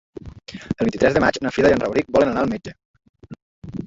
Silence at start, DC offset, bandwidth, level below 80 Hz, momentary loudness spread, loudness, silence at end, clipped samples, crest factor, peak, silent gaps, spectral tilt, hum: 0.25 s; under 0.1%; 7.8 kHz; -44 dBFS; 21 LU; -19 LUFS; 0 s; under 0.1%; 18 dB; -2 dBFS; 2.85-2.94 s, 3.09-3.14 s, 3.42-3.62 s; -6 dB/octave; none